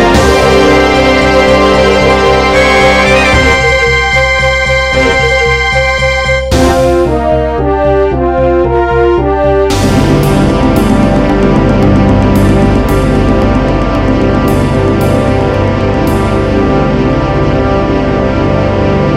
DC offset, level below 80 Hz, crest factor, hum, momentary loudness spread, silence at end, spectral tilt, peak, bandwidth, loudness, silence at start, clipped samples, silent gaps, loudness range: under 0.1%; -18 dBFS; 8 dB; none; 4 LU; 0 s; -6 dB/octave; 0 dBFS; 16 kHz; -8 LUFS; 0 s; 0.1%; none; 4 LU